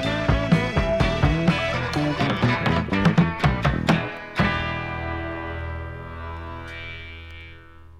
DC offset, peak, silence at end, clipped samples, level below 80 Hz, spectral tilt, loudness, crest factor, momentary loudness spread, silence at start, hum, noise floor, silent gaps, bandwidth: under 0.1%; -4 dBFS; 0 s; under 0.1%; -34 dBFS; -6.5 dB/octave; -23 LUFS; 18 dB; 15 LU; 0 s; none; -44 dBFS; none; 11 kHz